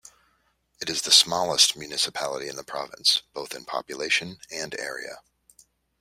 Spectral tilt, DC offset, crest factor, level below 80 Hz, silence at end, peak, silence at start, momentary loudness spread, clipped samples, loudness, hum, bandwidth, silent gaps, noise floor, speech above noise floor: 0 dB/octave; under 0.1%; 26 dB; -68 dBFS; 0.8 s; -2 dBFS; 0.8 s; 18 LU; under 0.1%; -23 LUFS; none; 16 kHz; none; -69 dBFS; 43 dB